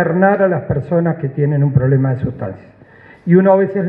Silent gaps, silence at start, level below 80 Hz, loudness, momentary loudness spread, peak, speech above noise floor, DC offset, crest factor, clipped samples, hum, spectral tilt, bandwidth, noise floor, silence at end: none; 0 s; -44 dBFS; -15 LUFS; 11 LU; 0 dBFS; 29 dB; under 0.1%; 14 dB; under 0.1%; none; -12.5 dB/octave; 3.5 kHz; -43 dBFS; 0 s